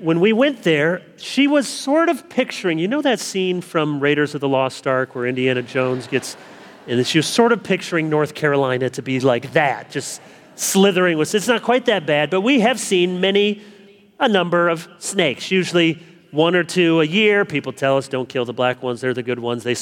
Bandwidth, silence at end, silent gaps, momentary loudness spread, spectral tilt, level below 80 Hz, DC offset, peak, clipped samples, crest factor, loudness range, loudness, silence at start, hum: 19 kHz; 0 s; none; 8 LU; -4.5 dB/octave; -70 dBFS; under 0.1%; -2 dBFS; under 0.1%; 18 dB; 2 LU; -18 LUFS; 0 s; none